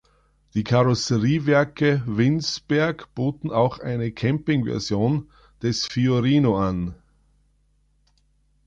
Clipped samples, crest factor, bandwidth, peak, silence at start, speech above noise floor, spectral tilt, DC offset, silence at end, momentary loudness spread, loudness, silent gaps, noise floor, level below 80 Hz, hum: under 0.1%; 16 dB; 7.6 kHz; -6 dBFS; 0.55 s; 42 dB; -6.5 dB/octave; under 0.1%; 1.7 s; 8 LU; -22 LUFS; none; -63 dBFS; -48 dBFS; 50 Hz at -45 dBFS